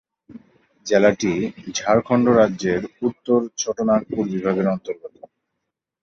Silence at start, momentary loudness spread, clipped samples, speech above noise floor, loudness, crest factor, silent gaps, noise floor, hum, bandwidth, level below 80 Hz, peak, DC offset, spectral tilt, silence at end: 0.3 s; 10 LU; under 0.1%; 60 dB; -20 LUFS; 18 dB; none; -80 dBFS; none; 7.6 kHz; -54 dBFS; -2 dBFS; under 0.1%; -5.5 dB/octave; 0.95 s